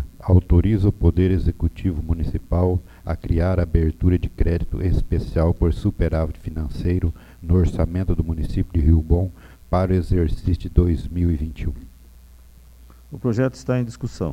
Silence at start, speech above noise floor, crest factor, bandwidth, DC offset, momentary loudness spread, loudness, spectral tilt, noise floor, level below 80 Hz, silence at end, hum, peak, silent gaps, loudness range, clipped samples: 0 s; 26 dB; 20 dB; 8.2 kHz; under 0.1%; 9 LU; -22 LUFS; -9.5 dB/octave; -46 dBFS; -26 dBFS; 0 s; none; -2 dBFS; none; 4 LU; under 0.1%